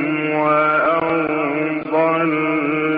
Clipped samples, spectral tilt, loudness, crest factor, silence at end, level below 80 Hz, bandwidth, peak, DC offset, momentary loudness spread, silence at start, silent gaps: under 0.1%; -4.5 dB/octave; -18 LUFS; 12 dB; 0 s; -60 dBFS; 4.8 kHz; -6 dBFS; under 0.1%; 5 LU; 0 s; none